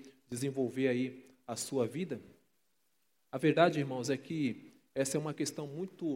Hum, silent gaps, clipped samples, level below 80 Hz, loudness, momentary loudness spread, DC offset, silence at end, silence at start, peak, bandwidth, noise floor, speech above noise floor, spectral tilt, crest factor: none; none; under 0.1%; -82 dBFS; -35 LUFS; 15 LU; under 0.1%; 0 s; 0 s; -12 dBFS; 16.5 kHz; -79 dBFS; 46 dB; -5 dB/octave; 24 dB